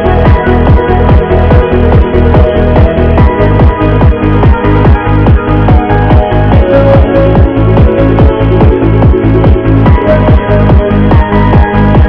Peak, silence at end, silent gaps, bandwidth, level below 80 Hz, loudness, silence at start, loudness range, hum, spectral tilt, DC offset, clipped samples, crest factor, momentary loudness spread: 0 dBFS; 0 s; none; 5.4 kHz; -10 dBFS; -6 LUFS; 0 s; 1 LU; none; -11 dB/octave; 0.9%; 20%; 4 dB; 1 LU